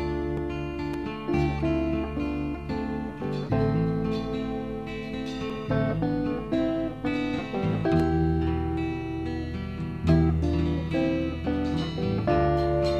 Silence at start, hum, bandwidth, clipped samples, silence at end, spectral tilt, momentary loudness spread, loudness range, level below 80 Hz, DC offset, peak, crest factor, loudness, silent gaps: 0 s; none; 8.4 kHz; under 0.1%; 0 s; -8.5 dB/octave; 8 LU; 3 LU; -38 dBFS; 0.2%; -10 dBFS; 16 dB; -28 LUFS; none